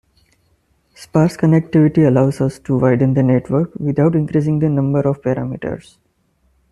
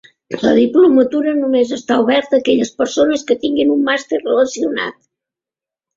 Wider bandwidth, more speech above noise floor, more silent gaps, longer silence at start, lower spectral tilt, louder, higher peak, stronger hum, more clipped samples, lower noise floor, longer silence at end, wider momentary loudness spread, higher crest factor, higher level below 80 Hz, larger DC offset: first, 11.5 kHz vs 7.6 kHz; second, 46 dB vs 74 dB; neither; first, 1 s vs 0.3 s; first, -9 dB/octave vs -4 dB/octave; about the same, -16 LUFS vs -15 LUFS; about the same, -2 dBFS vs 0 dBFS; neither; neither; second, -61 dBFS vs -88 dBFS; second, 0.9 s vs 1.05 s; about the same, 8 LU vs 8 LU; about the same, 14 dB vs 14 dB; first, -48 dBFS vs -56 dBFS; neither